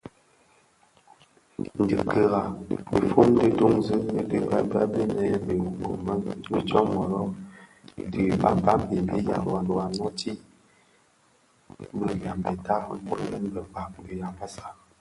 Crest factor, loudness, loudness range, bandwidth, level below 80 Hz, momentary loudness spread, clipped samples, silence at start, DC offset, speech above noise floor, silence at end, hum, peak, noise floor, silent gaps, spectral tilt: 22 dB; -26 LUFS; 9 LU; 11.5 kHz; -50 dBFS; 16 LU; under 0.1%; 0.05 s; under 0.1%; 38 dB; 0.3 s; none; -4 dBFS; -63 dBFS; none; -7.5 dB/octave